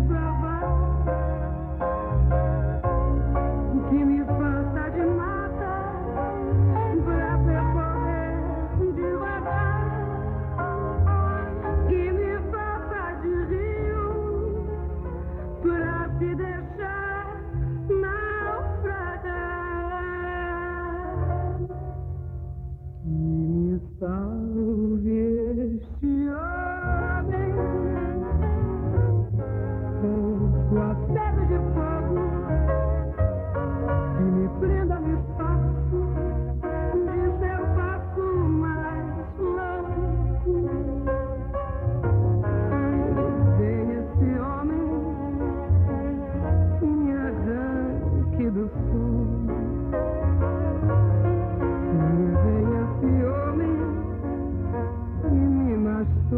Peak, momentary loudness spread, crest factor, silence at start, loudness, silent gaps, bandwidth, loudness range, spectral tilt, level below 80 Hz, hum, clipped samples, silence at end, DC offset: -10 dBFS; 7 LU; 14 dB; 0 s; -26 LUFS; none; 3.2 kHz; 5 LU; -12.5 dB/octave; -30 dBFS; none; under 0.1%; 0 s; under 0.1%